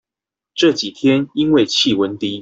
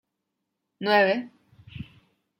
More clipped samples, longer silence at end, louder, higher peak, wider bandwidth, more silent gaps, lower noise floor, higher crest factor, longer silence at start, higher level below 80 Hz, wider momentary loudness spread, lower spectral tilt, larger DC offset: neither; second, 0 s vs 0.55 s; first, -16 LUFS vs -23 LUFS; first, -2 dBFS vs -8 dBFS; second, 8 kHz vs 16 kHz; neither; first, -87 dBFS vs -81 dBFS; second, 14 dB vs 20 dB; second, 0.55 s vs 0.8 s; first, -56 dBFS vs -66 dBFS; second, 5 LU vs 24 LU; second, -4.5 dB/octave vs -6.5 dB/octave; neither